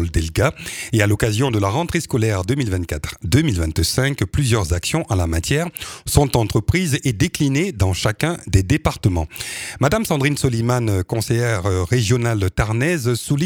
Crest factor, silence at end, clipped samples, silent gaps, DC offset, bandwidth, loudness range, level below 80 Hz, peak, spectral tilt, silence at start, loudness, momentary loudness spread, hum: 18 dB; 0 s; under 0.1%; none; under 0.1%; 18.5 kHz; 1 LU; -32 dBFS; 0 dBFS; -5.5 dB/octave; 0 s; -19 LUFS; 4 LU; none